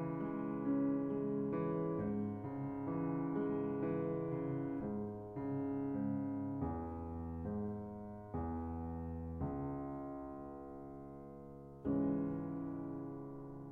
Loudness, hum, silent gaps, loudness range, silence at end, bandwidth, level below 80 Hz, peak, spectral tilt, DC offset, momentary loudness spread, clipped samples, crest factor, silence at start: -41 LUFS; none; none; 6 LU; 0 s; 3.2 kHz; -58 dBFS; -26 dBFS; -11.5 dB/octave; under 0.1%; 12 LU; under 0.1%; 14 dB; 0 s